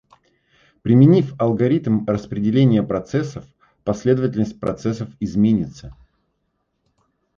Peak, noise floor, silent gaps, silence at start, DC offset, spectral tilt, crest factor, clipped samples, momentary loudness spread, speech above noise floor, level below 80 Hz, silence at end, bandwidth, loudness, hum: -2 dBFS; -71 dBFS; none; 0.85 s; under 0.1%; -8.5 dB/octave; 18 dB; under 0.1%; 13 LU; 53 dB; -50 dBFS; 1.45 s; 7.4 kHz; -19 LUFS; none